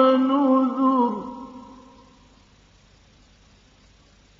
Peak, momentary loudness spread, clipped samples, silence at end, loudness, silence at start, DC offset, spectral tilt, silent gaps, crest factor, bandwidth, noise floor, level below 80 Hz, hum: -4 dBFS; 22 LU; under 0.1%; 2.8 s; -20 LUFS; 0 s; under 0.1%; -4.5 dB/octave; none; 20 dB; 6.2 kHz; -55 dBFS; -60 dBFS; none